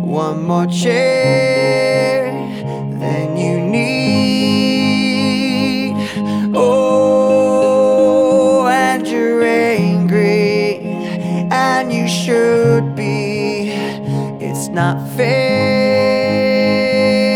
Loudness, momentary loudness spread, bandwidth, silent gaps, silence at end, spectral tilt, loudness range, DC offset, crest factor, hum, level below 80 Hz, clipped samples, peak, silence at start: -14 LUFS; 8 LU; 16 kHz; none; 0 s; -6 dB/octave; 4 LU; under 0.1%; 12 dB; none; -58 dBFS; under 0.1%; -2 dBFS; 0 s